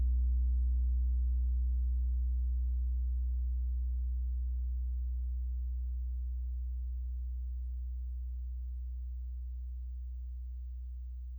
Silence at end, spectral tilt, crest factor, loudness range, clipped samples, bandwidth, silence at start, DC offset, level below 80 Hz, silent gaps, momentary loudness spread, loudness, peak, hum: 0 s; -11 dB/octave; 8 dB; 8 LU; under 0.1%; 0.4 kHz; 0 s; under 0.1%; -34 dBFS; none; 11 LU; -37 LUFS; -26 dBFS; none